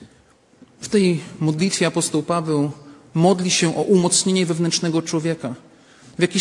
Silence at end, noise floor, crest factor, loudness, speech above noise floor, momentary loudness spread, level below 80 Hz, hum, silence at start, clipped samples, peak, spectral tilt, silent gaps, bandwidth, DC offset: 0 s; -54 dBFS; 18 dB; -19 LUFS; 35 dB; 11 LU; -62 dBFS; none; 0 s; under 0.1%; -2 dBFS; -4.5 dB/octave; none; 11.5 kHz; under 0.1%